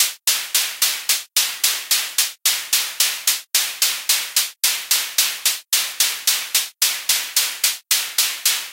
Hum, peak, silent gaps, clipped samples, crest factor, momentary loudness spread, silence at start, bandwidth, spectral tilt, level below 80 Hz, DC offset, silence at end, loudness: none; 0 dBFS; none; under 0.1%; 20 dB; 3 LU; 0 s; 17.5 kHz; 5 dB/octave; -78 dBFS; under 0.1%; 0 s; -18 LUFS